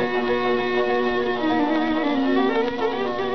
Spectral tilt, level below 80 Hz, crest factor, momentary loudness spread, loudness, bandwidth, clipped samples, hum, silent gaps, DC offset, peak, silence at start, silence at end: -6 dB/octave; -52 dBFS; 12 dB; 3 LU; -22 LUFS; 6.4 kHz; under 0.1%; none; none; 1%; -10 dBFS; 0 s; 0 s